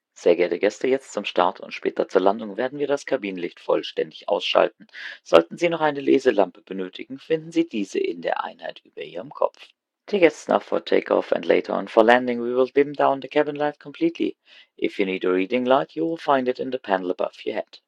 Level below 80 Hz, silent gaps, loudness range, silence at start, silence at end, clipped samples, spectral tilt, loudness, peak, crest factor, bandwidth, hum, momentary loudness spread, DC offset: -70 dBFS; none; 4 LU; 0.2 s; 0.1 s; under 0.1%; -5 dB/octave; -23 LUFS; 0 dBFS; 22 dB; 9.8 kHz; none; 11 LU; under 0.1%